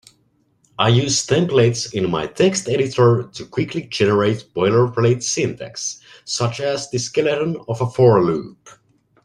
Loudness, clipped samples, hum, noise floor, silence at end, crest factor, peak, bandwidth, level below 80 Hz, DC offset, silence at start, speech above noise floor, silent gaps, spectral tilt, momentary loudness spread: -18 LUFS; under 0.1%; none; -62 dBFS; 0.55 s; 18 dB; -2 dBFS; 11 kHz; -54 dBFS; under 0.1%; 0.8 s; 44 dB; none; -5 dB/octave; 11 LU